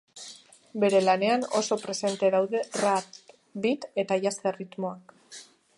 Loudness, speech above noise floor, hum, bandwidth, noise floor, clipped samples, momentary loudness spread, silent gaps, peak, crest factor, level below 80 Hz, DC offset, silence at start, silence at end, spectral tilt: -27 LUFS; 23 dB; none; 11.5 kHz; -50 dBFS; under 0.1%; 22 LU; none; -8 dBFS; 18 dB; -78 dBFS; under 0.1%; 0.15 s; 0.35 s; -4 dB/octave